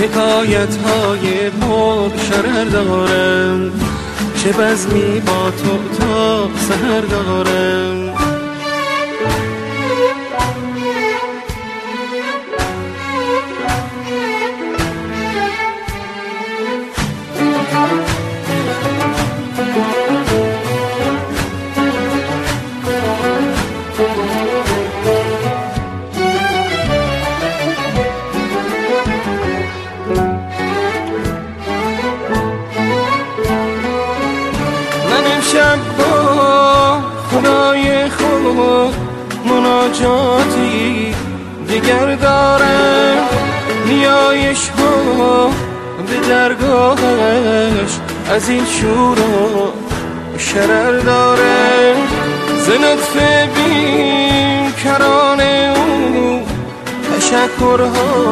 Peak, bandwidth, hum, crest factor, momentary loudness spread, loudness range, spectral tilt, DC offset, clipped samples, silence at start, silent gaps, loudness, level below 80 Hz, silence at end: 0 dBFS; 13.5 kHz; none; 14 dB; 10 LU; 7 LU; -4.5 dB/octave; under 0.1%; under 0.1%; 0 s; none; -14 LUFS; -34 dBFS; 0 s